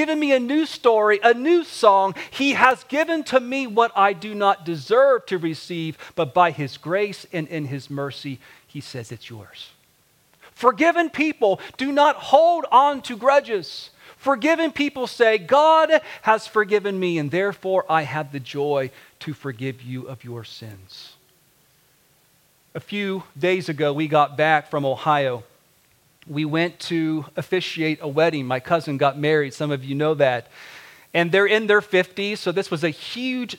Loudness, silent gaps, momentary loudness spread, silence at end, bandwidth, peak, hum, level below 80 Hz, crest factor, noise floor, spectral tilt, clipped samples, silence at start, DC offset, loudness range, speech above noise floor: -20 LUFS; none; 18 LU; 0 s; 17 kHz; 0 dBFS; none; -68 dBFS; 20 dB; -60 dBFS; -5.5 dB/octave; under 0.1%; 0 s; under 0.1%; 11 LU; 40 dB